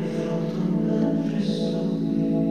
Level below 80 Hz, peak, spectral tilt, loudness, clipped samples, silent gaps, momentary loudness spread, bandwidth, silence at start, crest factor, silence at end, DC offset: -56 dBFS; -12 dBFS; -8 dB/octave; -24 LUFS; under 0.1%; none; 3 LU; 9.8 kHz; 0 s; 12 dB; 0 s; 0.3%